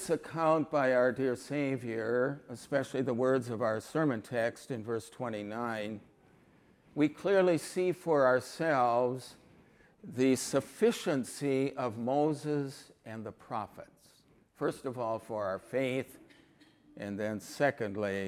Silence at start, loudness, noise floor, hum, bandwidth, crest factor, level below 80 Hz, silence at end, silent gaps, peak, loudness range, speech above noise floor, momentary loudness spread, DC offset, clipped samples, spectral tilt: 0 s; -32 LUFS; -65 dBFS; none; 16 kHz; 18 dB; -72 dBFS; 0 s; none; -14 dBFS; 7 LU; 33 dB; 14 LU; under 0.1%; under 0.1%; -5.5 dB/octave